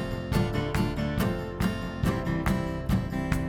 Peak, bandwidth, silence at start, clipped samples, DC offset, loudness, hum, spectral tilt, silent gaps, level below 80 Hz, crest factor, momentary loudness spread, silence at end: -12 dBFS; 19 kHz; 0 s; under 0.1%; under 0.1%; -29 LUFS; none; -6.5 dB/octave; none; -36 dBFS; 16 dB; 2 LU; 0 s